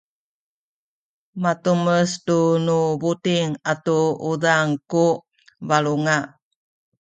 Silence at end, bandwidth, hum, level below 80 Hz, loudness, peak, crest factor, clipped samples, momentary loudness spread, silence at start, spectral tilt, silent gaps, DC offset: 0.75 s; 9.4 kHz; none; -66 dBFS; -20 LUFS; -4 dBFS; 18 dB; under 0.1%; 6 LU; 1.35 s; -5.5 dB/octave; none; under 0.1%